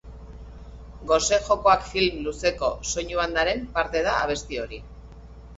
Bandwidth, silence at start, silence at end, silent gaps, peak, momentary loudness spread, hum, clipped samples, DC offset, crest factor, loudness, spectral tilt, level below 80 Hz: 8.2 kHz; 0.05 s; 0 s; none; -6 dBFS; 23 LU; none; under 0.1%; under 0.1%; 20 dB; -24 LUFS; -3 dB/octave; -42 dBFS